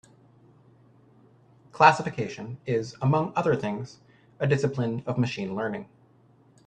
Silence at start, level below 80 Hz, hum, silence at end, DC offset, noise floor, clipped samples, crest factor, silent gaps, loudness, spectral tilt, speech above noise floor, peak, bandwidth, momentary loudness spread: 1.75 s; -64 dBFS; none; 0.8 s; under 0.1%; -59 dBFS; under 0.1%; 26 dB; none; -26 LUFS; -6.5 dB/octave; 33 dB; -2 dBFS; 9.4 kHz; 15 LU